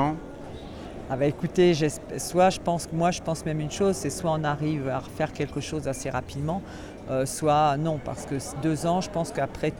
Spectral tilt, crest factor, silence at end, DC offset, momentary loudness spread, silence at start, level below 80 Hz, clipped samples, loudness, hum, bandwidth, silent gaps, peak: -5.5 dB/octave; 18 dB; 0 s; under 0.1%; 12 LU; 0 s; -48 dBFS; under 0.1%; -27 LUFS; none; 17.5 kHz; none; -8 dBFS